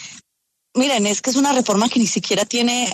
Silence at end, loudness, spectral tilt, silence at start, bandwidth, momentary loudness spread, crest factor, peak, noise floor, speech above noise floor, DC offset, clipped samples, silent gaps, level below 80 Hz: 0 s; -18 LUFS; -3 dB/octave; 0 s; 13.5 kHz; 3 LU; 14 dB; -6 dBFS; -74 dBFS; 56 dB; under 0.1%; under 0.1%; none; -64 dBFS